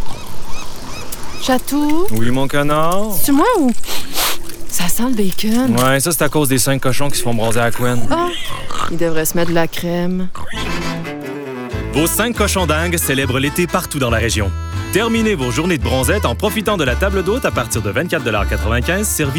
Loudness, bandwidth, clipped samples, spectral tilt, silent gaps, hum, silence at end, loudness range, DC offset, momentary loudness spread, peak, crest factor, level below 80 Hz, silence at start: -17 LUFS; over 20 kHz; under 0.1%; -4.5 dB/octave; none; none; 0 s; 3 LU; under 0.1%; 10 LU; -2 dBFS; 12 dB; -28 dBFS; 0 s